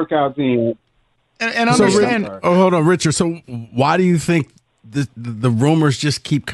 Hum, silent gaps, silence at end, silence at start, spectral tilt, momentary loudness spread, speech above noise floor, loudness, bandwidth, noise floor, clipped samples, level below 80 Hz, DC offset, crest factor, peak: none; none; 0 s; 0 s; -5.5 dB/octave; 11 LU; 46 dB; -17 LUFS; 12.5 kHz; -62 dBFS; under 0.1%; -52 dBFS; under 0.1%; 14 dB; -2 dBFS